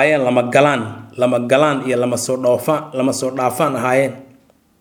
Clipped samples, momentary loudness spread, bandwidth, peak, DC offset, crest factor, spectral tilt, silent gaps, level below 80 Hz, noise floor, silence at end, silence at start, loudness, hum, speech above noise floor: under 0.1%; 6 LU; 20 kHz; 0 dBFS; under 0.1%; 16 dB; -5 dB/octave; none; -64 dBFS; -52 dBFS; 0.55 s; 0 s; -16 LUFS; none; 36 dB